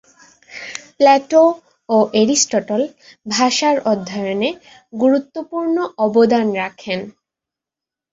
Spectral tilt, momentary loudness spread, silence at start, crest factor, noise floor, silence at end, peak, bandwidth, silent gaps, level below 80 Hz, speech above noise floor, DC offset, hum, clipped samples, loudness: -3.5 dB/octave; 18 LU; 0.5 s; 16 dB; -87 dBFS; 1.05 s; -2 dBFS; 8 kHz; none; -62 dBFS; 71 dB; under 0.1%; none; under 0.1%; -17 LUFS